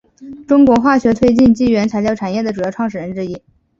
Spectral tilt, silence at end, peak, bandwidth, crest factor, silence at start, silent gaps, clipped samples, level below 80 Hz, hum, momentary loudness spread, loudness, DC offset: -7 dB/octave; 0.4 s; -2 dBFS; 7.6 kHz; 14 dB; 0.2 s; none; under 0.1%; -42 dBFS; none; 13 LU; -14 LUFS; under 0.1%